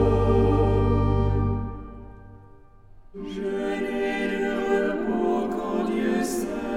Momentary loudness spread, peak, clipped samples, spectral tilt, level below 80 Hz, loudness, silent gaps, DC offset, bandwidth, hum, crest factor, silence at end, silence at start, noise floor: 16 LU; -10 dBFS; under 0.1%; -7 dB/octave; -34 dBFS; -24 LUFS; none; under 0.1%; 15 kHz; none; 14 dB; 0 s; 0 s; -49 dBFS